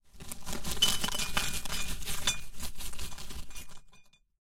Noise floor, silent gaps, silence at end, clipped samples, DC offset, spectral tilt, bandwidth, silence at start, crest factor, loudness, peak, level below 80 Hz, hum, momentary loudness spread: -57 dBFS; none; 0.4 s; under 0.1%; under 0.1%; -1 dB/octave; 17 kHz; 0.15 s; 20 dB; -33 LUFS; -12 dBFS; -44 dBFS; none; 18 LU